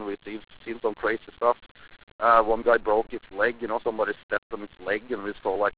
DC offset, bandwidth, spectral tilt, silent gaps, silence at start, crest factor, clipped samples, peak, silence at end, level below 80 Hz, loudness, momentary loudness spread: 0.3%; 4 kHz; -8 dB/octave; 1.71-1.75 s, 2.03-2.19 s, 4.23-4.29 s, 4.38-4.50 s; 0 s; 20 dB; under 0.1%; -6 dBFS; 0.05 s; -56 dBFS; -26 LUFS; 15 LU